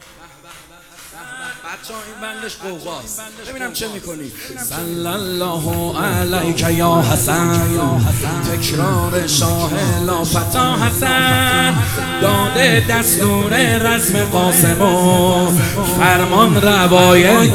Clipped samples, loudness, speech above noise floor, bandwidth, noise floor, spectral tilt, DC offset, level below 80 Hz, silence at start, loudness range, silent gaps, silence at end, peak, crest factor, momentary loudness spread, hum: under 0.1%; -14 LUFS; 26 dB; 16 kHz; -41 dBFS; -4 dB/octave; under 0.1%; -34 dBFS; 0.2 s; 14 LU; none; 0 s; 0 dBFS; 16 dB; 17 LU; none